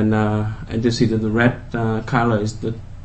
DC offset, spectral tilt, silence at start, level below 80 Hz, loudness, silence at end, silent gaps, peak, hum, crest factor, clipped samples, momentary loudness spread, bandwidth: under 0.1%; -7 dB/octave; 0 s; -38 dBFS; -20 LUFS; 0 s; none; -2 dBFS; none; 18 dB; under 0.1%; 7 LU; 8.6 kHz